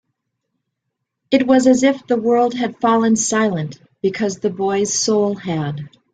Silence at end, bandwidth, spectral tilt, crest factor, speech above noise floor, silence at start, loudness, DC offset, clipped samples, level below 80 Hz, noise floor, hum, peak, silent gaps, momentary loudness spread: 0.25 s; 9.4 kHz; -4.5 dB/octave; 16 dB; 60 dB; 1.3 s; -17 LUFS; under 0.1%; under 0.1%; -58 dBFS; -77 dBFS; none; -2 dBFS; none; 10 LU